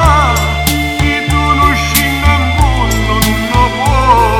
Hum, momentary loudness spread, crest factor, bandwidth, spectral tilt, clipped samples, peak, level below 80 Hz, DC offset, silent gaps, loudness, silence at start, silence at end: none; 4 LU; 10 dB; 18.5 kHz; -4.5 dB/octave; 0.1%; 0 dBFS; -16 dBFS; under 0.1%; none; -11 LUFS; 0 s; 0 s